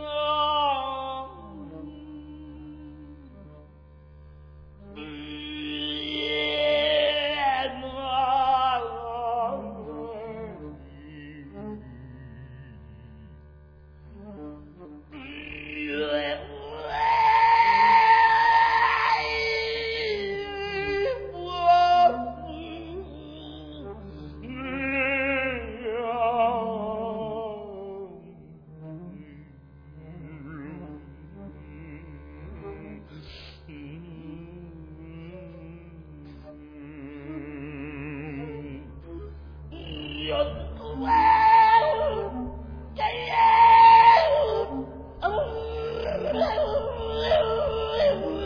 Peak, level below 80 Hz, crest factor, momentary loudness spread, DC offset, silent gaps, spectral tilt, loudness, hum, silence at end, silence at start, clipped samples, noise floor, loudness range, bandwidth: -6 dBFS; -46 dBFS; 20 dB; 26 LU; under 0.1%; none; -5.5 dB/octave; -23 LUFS; none; 0 s; 0 s; under 0.1%; -50 dBFS; 24 LU; 5.2 kHz